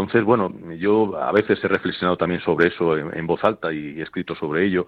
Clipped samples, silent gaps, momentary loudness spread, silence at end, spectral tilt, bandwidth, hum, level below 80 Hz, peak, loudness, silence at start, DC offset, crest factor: under 0.1%; none; 9 LU; 0.05 s; -8.5 dB/octave; 5.4 kHz; none; -54 dBFS; -4 dBFS; -21 LUFS; 0 s; under 0.1%; 18 dB